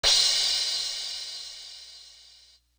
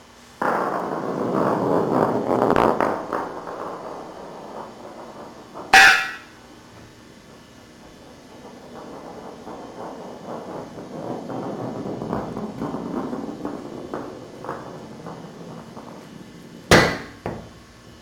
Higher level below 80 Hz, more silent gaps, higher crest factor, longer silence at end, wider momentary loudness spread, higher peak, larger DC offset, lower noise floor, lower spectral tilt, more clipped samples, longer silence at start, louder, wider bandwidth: about the same, -54 dBFS vs -50 dBFS; neither; about the same, 20 dB vs 24 dB; first, 0.7 s vs 0 s; about the same, 24 LU vs 23 LU; second, -10 dBFS vs 0 dBFS; neither; first, -57 dBFS vs -46 dBFS; second, 2.5 dB/octave vs -4 dB/octave; neither; about the same, 0.05 s vs 0 s; second, -24 LUFS vs -21 LUFS; about the same, over 20 kHz vs 19 kHz